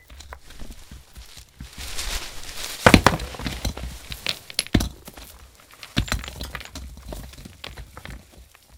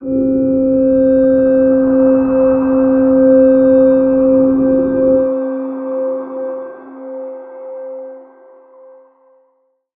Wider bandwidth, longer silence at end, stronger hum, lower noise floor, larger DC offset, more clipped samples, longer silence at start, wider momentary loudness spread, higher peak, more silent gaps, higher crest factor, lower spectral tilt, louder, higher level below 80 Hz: first, 18 kHz vs 2.8 kHz; second, 0 s vs 1.75 s; neither; second, -50 dBFS vs -60 dBFS; neither; neither; about the same, 0.1 s vs 0 s; first, 24 LU vs 19 LU; about the same, 0 dBFS vs -2 dBFS; neither; first, 26 dB vs 12 dB; second, -4 dB/octave vs -13 dB/octave; second, -24 LUFS vs -12 LUFS; first, -36 dBFS vs -44 dBFS